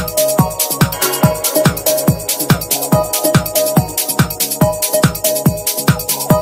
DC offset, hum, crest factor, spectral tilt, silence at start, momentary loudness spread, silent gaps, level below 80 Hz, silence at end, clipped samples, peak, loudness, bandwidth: under 0.1%; none; 14 dB; -4.5 dB/octave; 0 s; 2 LU; none; -36 dBFS; 0 s; under 0.1%; 0 dBFS; -14 LUFS; 16.5 kHz